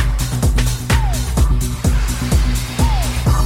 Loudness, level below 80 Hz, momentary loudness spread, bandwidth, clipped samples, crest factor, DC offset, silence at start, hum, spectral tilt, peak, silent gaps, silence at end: -18 LUFS; -18 dBFS; 2 LU; 16.5 kHz; under 0.1%; 12 dB; under 0.1%; 0 s; none; -5 dB/octave; -2 dBFS; none; 0 s